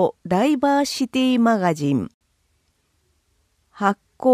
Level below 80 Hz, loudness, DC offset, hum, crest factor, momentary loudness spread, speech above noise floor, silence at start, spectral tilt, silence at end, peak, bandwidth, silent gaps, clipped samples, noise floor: -60 dBFS; -20 LUFS; under 0.1%; none; 16 dB; 6 LU; 47 dB; 0 s; -5.5 dB/octave; 0 s; -6 dBFS; 15.5 kHz; 2.14-2.21 s; under 0.1%; -67 dBFS